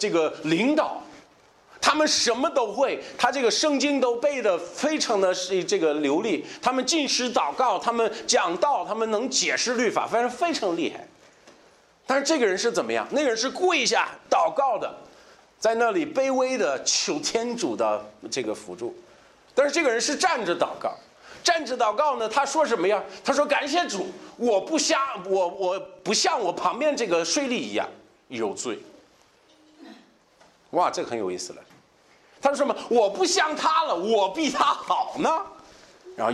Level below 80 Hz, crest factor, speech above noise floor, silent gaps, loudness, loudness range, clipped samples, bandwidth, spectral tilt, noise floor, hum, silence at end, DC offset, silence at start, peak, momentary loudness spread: -70 dBFS; 20 dB; 34 dB; none; -24 LUFS; 5 LU; under 0.1%; 13 kHz; -2 dB/octave; -58 dBFS; none; 0 s; under 0.1%; 0 s; -6 dBFS; 9 LU